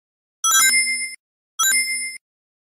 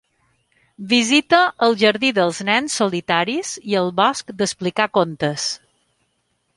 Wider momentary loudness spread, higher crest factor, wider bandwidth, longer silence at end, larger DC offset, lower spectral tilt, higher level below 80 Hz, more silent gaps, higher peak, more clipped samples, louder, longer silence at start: first, 16 LU vs 9 LU; about the same, 16 dB vs 18 dB; first, 16 kHz vs 11.5 kHz; second, 0.65 s vs 1 s; neither; second, 4.5 dB/octave vs -3.5 dB/octave; second, -72 dBFS vs -62 dBFS; first, 1.19-1.58 s vs none; second, -6 dBFS vs -2 dBFS; neither; about the same, -17 LUFS vs -18 LUFS; second, 0.45 s vs 0.8 s